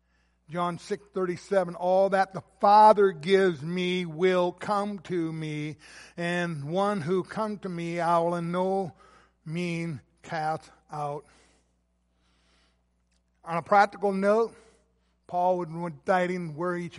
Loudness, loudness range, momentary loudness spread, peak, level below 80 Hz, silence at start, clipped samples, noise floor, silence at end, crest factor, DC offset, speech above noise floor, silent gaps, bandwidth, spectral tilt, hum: -27 LUFS; 13 LU; 13 LU; -6 dBFS; -68 dBFS; 0.5 s; under 0.1%; -71 dBFS; 0 s; 22 dB; under 0.1%; 45 dB; none; 11.5 kHz; -6.5 dB/octave; 60 Hz at -55 dBFS